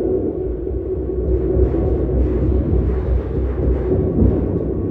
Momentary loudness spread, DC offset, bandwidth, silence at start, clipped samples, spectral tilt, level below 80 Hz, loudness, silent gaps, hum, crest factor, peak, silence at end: 6 LU; under 0.1%; 3 kHz; 0 s; under 0.1%; -12.5 dB/octave; -22 dBFS; -19 LUFS; none; none; 16 dB; -2 dBFS; 0 s